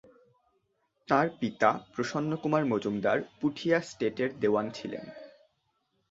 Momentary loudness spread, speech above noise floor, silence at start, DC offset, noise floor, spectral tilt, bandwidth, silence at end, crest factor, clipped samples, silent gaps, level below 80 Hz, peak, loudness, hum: 11 LU; 47 dB; 1.1 s; under 0.1%; -76 dBFS; -6 dB/octave; 8 kHz; 0.85 s; 24 dB; under 0.1%; none; -70 dBFS; -8 dBFS; -30 LUFS; none